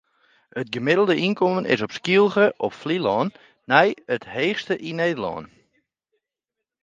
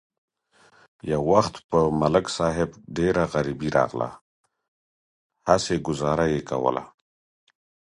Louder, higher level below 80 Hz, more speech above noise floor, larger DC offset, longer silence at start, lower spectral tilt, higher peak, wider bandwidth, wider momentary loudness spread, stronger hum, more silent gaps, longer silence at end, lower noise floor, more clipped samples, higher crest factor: about the same, -22 LUFS vs -24 LUFS; second, -64 dBFS vs -48 dBFS; first, 64 dB vs 36 dB; neither; second, 0.55 s vs 1.05 s; about the same, -6 dB/octave vs -6 dB/octave; about the same, 0 dBFS vs -2 dBFS; second, 7.6 kHz vs 11.5 kHz; first, 11 LU vs 8 LU; neither; second, none vs 1.64-1.69 s, 4.21-4.44 s, 4.68-5.30 s; first, 1.35 s vs 1.1 s; first, -85 dBFS vs -59 dBFS; neither; about the same, 22 dB vs 24 dB